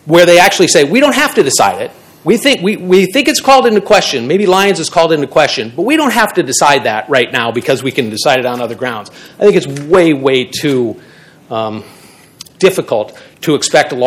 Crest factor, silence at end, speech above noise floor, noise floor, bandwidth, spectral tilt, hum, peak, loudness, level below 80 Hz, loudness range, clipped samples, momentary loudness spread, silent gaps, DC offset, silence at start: 12 dB; 0 s; 26 dB; -37 dBFS; 18 kHz; -3.5 dB/octave; none; 0 dBFS; -10 LUFS; -50 dBFS; 5 LU; 2%; 12 LU; none; under 0.1%; 0.05 s